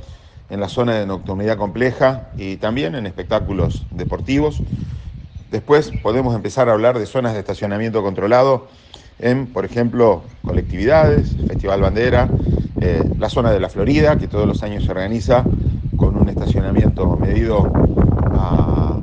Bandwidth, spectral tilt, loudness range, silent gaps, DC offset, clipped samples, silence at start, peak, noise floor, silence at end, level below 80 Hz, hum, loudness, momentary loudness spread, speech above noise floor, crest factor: 8.8 kHz; -8 dB/octave; 4 LU; none; under 0.1%; under 0.1%; 0 s; 0 dBFS; -38 dBFS; 0 s; -26 dBFS; none; -17 LUFS; 9 LU; 22 dB; 16 dB